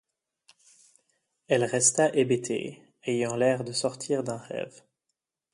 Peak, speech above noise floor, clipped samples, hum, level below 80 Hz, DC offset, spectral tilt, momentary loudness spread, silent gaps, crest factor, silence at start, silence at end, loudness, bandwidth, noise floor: -8 dBFS; 57 dB; under 0.1%; none; -72 dBFS; under 0.1%; -3.5 dB/octave; 15 LU; none; 20 dB; 1.5 s; 0.85 s; -27 LUFS; 11.5 kHz; -84 dBFS